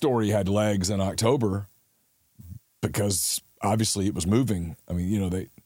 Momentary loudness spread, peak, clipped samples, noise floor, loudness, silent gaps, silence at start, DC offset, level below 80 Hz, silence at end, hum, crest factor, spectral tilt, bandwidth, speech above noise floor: 10 LU; -8 dBFS; under 0.1%; -68 dBFS; -26 LUFS; none; 0 s; under 0.1%; -50 dBFS; 0.2 s; none; 18 dB; -5 dB/octave; 17 kHz; 43 dB